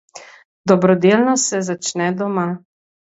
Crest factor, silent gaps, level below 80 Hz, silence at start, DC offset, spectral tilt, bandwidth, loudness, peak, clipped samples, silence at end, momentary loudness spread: 18 dB; 0.45-0.64 s; -64 dBFS; 0.15 s; under 0.1%; -5 dB/octave; 8 kHz; -17 LUFS; 0 dBFS; under 0.1%; 0.6 s; 11 LU